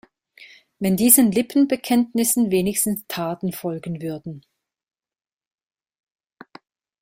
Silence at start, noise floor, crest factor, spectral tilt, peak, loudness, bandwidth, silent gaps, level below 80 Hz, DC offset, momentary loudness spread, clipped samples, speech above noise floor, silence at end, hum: 0.4 s; -49 dBFS; 22 dB; -4.5 dB/octave; 0 dBFS; -20 LUFS; 16.5 kHz; none; -60 dBFS; under 0.1%; 16 LU; under 0.1%; 29 dB; 2.65 s; none